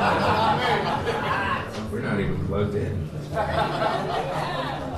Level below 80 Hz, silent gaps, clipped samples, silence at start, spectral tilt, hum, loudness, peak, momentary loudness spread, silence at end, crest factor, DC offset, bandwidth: -44 dBFS; none; under 0.1%; 0 s; -6 dB/octave; none; -25 LUFS; -10 dBFS; 8 LU; 0 s; 14 dB; under 0.1%; 14 kHz